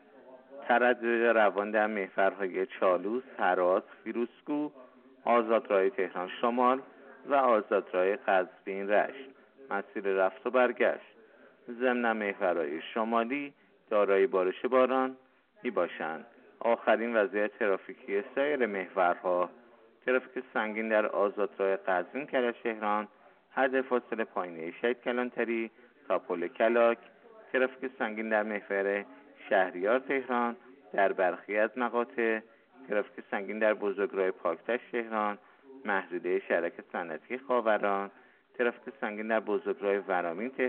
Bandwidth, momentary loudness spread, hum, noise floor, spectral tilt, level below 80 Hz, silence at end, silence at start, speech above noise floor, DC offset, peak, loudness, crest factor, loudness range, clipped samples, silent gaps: 4.3 kHz; 10 LU; none; -58 dBFS; -3 dB/octave; -84 dBFS; 0 s; 0.25 s; 28 dB; under 0.1%; -12 dBFS; -30 LUFS; 18 dB; 3 LU; under 0.1%; none